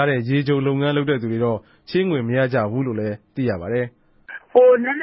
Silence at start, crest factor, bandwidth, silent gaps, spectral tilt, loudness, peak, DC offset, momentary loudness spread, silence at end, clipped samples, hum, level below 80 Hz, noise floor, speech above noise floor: 0 s; 18 dB; 5.8 kHz; none; -12 dB/octave; -20 LUFS; -2 dBFS; under 0.1%; 12 LU; 0 s; under 0.1%; none; -54 dBFS; -40 dBFS; 21 dB